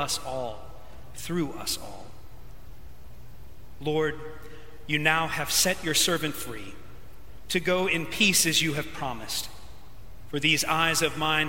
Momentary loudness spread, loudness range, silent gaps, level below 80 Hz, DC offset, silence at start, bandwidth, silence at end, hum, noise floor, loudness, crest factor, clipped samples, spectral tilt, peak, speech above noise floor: 20 LU; 11 LU; none; -50 dBFS; 1%; 0 s; 16.5 kHz; 0 s; none; -48 dBFS; -25 LUFS; 24 dB; under 0.1%; -2.5 dB/octave; -6 dBFS; 20 dB